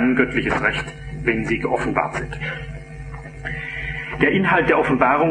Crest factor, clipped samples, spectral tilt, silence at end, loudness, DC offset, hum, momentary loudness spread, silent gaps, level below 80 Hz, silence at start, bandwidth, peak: 20 dB; under 0.1%; -6.5 dB/octave; 0 s; -20 LUFS; under 0.1%; none; 16 LU; none; -38 dBFS; 0 s; 10 kHz; -2 dBFS